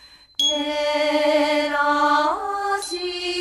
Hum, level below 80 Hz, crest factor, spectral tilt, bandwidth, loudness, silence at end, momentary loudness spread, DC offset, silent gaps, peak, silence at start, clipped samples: none; -58 dBFS; 14 dB; -1 dB/octave; 13 kHz; -20 LUFS; 0 s; 7 LU; under 0.1%; none; -8 dBFS; 0.05 s; under 0.1%